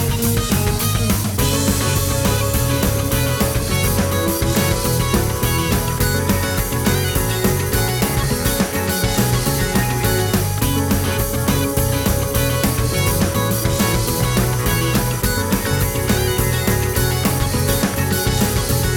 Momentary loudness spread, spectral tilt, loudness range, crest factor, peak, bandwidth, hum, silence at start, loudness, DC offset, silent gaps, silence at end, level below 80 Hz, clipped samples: 1 LU; -4.5 dB/octave; 0 LU; 14 dB; -4 dBFS; over 20 kHz; none; 0 s; -18 LUFS; under 0.1%; none; 0 s; -26 dBFS; under 0.1%